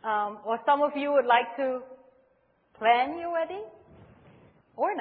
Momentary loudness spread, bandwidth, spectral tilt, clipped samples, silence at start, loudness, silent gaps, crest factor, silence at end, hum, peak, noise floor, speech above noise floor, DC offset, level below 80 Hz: 11 LU; 4.6 kHz; -7 dB/octave; under 0.1%; 0.05 s; -27 LUFS; none; 20 dB; 0 s; none; -10 dBFS; -67 dBFS; 41 dB; under 0.1%; -72 dBFS